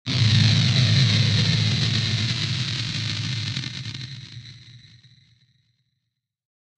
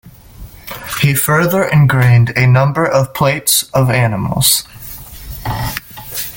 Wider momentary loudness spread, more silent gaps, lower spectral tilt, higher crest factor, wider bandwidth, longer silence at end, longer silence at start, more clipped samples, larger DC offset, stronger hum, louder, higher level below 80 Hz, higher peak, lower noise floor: about the same, 17 LU vs 18 LU; neither; about the same, -4.5 dB/octave vs -4.5 dB/octave; about the same, 18 dB vs 14 dB; second, 9.6 kHz vs 17 kHz; first, 2 s vs 0 s; about the same, 0.05 s vs 0.05 s; neither; neither; neither; second, -21 LUFS vs -12 LUFS; second, -50 dBFS vs -38 dBFS; second, -4 dBFS vs 0 dBFS; first, -79 dBFS vs -35 dBFS